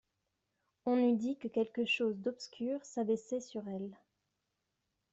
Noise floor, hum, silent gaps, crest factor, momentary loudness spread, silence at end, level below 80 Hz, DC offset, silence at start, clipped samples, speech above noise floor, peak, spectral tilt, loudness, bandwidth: -85 dBFS; none; none; 16 dB; 11 LU; 1.2 s; -80 dBFS; under 0.1%; 0.85 s; under 0.1%; 50 dB; -22 dBFS; -5 dB/octave; -36 LUFS; 8 kHz